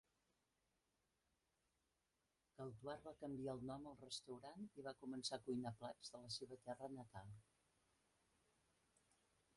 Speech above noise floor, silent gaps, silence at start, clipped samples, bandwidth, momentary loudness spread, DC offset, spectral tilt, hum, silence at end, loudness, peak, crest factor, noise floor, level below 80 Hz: 36 dB; none; 2.6 s; under 0.1%; 11.5 kHz; 9 LU; under 0.1%; -4.5 dB/octave; none; 2.15 s; -53 LUFS; -34 dBFS; 22 dB; -89 dBFS; -82 dBFS